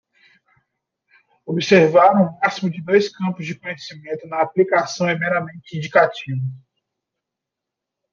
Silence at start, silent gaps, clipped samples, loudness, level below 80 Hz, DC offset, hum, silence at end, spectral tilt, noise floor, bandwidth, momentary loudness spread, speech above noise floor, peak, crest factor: 1.45 s; none; under 0.1%; -18 LUFS; -66 dBFS; under 0.1%; none; 1.55 s; -6 dB/octave; -84 dBFS; 7.4 kHz; 17 LU; 65 dB; -2 dBFS; 18 dB